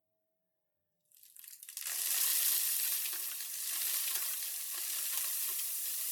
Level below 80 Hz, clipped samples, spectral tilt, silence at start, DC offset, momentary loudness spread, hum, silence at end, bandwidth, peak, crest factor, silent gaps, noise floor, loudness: under -90 dBFS; under 0.1%; 6 dB/octave; 1.25 s; under 0.1%; 11 LU; none; 0 s; 19 kHz; -14 dBFS; 22 dB; none; -84 dBFS; -33 LUFS